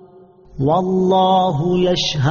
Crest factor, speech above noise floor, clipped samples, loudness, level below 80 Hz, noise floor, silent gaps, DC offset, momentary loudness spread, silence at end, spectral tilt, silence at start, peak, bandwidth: 12 dB; 29 dB; under 0.1%; -16 LUFS; -46 dBFS; -45 dBFS; none; under 0.1%; 4 LU; 0 s; -5.5 dB/octave; 0.55 s; -6 dBFS; 7.2 kHz